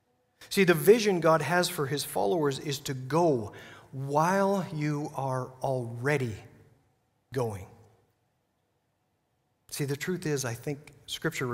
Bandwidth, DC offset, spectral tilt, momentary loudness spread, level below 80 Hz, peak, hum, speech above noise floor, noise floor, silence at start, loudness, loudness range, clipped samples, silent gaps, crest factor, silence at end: 16 kHz; under 0.1%; -5 dB/octave; 15 LU; -66 dBFS; -8 dBFS; none; 47 dB; -75 dBFS; 0.4 s; -28 LUFS; 13 LU; under 0.1%; none; 22 dB; 0 s